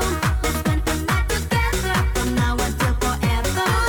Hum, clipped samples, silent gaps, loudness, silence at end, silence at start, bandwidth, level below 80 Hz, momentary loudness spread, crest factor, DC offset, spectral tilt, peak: none; under 0.1%; none; -21 LUFS; 0 s; 0 s; 19 kHz; -24 dBFS; 1 LU; 14 dB; under 0.1%; -4.5 dB/octave; -6 dBFS